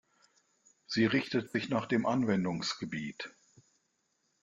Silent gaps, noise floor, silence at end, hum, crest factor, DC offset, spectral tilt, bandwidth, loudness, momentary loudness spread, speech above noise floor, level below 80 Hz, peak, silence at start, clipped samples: none; -78 dBFS; 1.15 s; none; 20 dB; under 0.1%; -5.5 dB/octave; 9 kHz; -32 LUFS; 11 LU; 46 dB; -70 dBFS; -16 dBFS; 0.9 s; under 0.1%